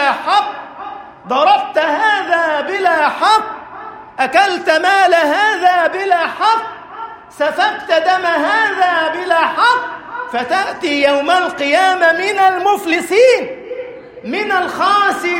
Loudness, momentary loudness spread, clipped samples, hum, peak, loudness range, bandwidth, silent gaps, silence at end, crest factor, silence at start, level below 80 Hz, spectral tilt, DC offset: -13 LUFS; 17 LU; under 0.1%; none; 0 dBFS; 2 LU; 16.5 kHz; none; 0 s; 14 dB; 0 s; -60 dBFS; -2.5 dB/octave; under 0.1%